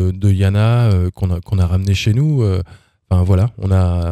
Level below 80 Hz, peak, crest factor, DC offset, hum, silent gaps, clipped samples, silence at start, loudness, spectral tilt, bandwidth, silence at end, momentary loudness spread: -32 dBFS; -4 dBFS; 10 dB; under 0.1%; none; none; under 0.1%; 0 s; -16 LUFS; -7.5 dB/octave; 9.4 kHz; 0 s; 6 LU